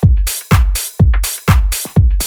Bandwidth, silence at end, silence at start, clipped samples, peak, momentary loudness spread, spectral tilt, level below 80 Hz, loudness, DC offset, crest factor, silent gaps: over 20 kHz; 0 s; 0 s; under 0.1%; 0 dBFS; 3 LU; -5 dB/octave; -14 dBFS; -14 LUFS; under 0.1%; 12 dB; none